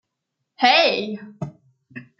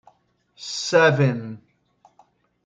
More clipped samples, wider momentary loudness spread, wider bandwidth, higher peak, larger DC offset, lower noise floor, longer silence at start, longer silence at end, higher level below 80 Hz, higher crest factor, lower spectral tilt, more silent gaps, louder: neither; about the same, 20 LU vs 21 LU; second, 7.4 kHz vs 9.2 kHz; first, 0 dBFS vs -4 dBFS; neither; first, -79 dBFS vs -62 dBFS; about the same, 0.6 s vs 0.6 s; second, 0.15 s vs 1.1 s; about the same, -68 dBFS vs -68 dBFS; about the same, 22 dB vs 20 dB; about the same, -4 dB/octave vs -5 dB/octave; neither; first, -17 LUFS vs -20 LUFS